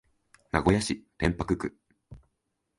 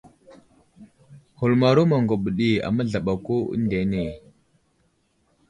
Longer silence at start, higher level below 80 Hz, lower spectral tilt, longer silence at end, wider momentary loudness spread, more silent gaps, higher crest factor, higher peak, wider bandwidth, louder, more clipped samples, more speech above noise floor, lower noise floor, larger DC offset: second, 0.55 s vs 0.8 s; first, -44 dBFS vs -50 dBFS; second, -5.5 dB/octave vs -8 dB/octave; second, 0.6 s vs 1.3 s; about the same, 8 LU vs 9 LU; neither; first, 24 dB vs 18 dB; about the same, -6 dBFS vs -6 dBFS; about the same, 11.5 kHz vs 10.5 kHz; second, -29 LUFS vs -22 LUFS; neither; first, 52 dB vs 45 dB; first, -80 dBFS vs -67 dBFS; neither